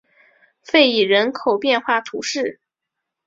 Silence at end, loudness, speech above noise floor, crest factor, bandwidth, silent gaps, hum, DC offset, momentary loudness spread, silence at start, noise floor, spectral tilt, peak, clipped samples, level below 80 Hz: 0.75 s; -18 LUFS; 64 dB; 18 dB; 7.8 kHz; none; none; under 0.1%; 10 LU; 0.7 s; -81 dBFS; -3 dB/octave; -2 dBFS; under 0.1%; -66 dBFS